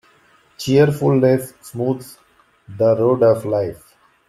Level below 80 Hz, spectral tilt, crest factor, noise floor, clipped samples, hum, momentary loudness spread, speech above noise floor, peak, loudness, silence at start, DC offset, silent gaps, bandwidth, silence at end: -56 dBFS; -7 dB/octave; 16 dB; -54 dBFS; under 0.1%; none; 13 LU; 38 dB; -2 dBFS; -17 LUFS; 0.6 s; under 0.1%; none; 14.5 kHz; 0.5 s